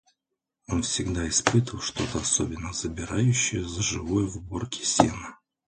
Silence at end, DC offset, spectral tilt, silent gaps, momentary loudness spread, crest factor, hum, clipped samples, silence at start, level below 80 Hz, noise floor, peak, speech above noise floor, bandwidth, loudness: 0.35 s; under 0.1%; -4 dB/octave; none; 9 LU; 26 dB; none; under 0.1%; 0.7 s; -44 dBFS; -84 dBFS; 0 dBFS; 58 dB; 9.6 kHz; -26 LUFS